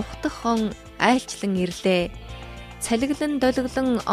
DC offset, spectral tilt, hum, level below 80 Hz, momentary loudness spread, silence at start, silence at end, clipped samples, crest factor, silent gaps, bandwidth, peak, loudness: under 0.1%; -5 dB/octave; none; -44 dBFS; 13 LU; 0 s; 0 s; under 0.1%; 20 dB; none; 13.5 kHz; -4 dBFS; -24 LUFS